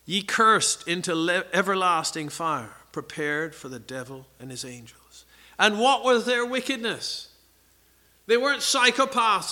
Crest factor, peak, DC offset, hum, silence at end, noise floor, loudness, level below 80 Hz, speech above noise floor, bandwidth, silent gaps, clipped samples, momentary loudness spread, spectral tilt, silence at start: 22 dB; -2 dBFS; under 0.1%; none; 0 s; -60 dBFS; -23 LUFS; -66 dBFS; 36 dB; 18.5 kHz; none; under 0.1%; 18 LU; -2.5 dB/octave; 0.05 s